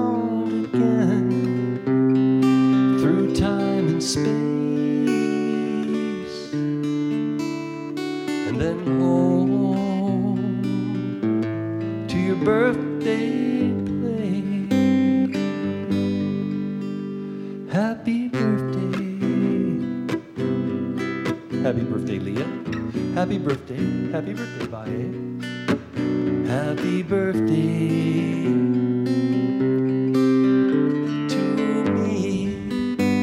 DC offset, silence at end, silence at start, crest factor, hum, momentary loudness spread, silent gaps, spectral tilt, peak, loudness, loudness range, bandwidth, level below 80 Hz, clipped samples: under 0.1%; 0 s; 0 s; 16 dB; none; 9 LU; none; -7 dB/octave; -6 dBFS; -22 LUFS; 6 LU; 11.5 kHz; -52 dBFS; under 0.1%